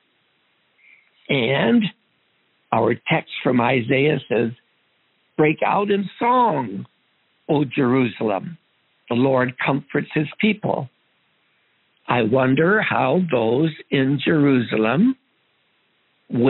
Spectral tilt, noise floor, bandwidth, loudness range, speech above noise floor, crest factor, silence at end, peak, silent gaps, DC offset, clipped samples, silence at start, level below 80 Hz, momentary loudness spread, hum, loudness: -5 dB/octave; -65 dBFS; 4.2 kHz; 4 LU; 46 dB; 20 dB; 0 s; 0 dBFS; none; under 0.1%; under 0.1%; 1.3 s; -64 dBFS; 9 LU; none; -20 LUFS